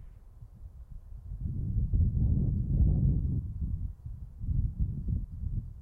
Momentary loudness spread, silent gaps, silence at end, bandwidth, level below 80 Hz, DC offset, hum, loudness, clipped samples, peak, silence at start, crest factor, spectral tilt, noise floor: 21 LU; none; 0 s; 1.2 kHz; -34 dBFS; under 0.1%; none; -32 LUFS; under 0.1%; -16 dBFS; 0 s; 16 dB; -13 dB/octave; -50 dBFS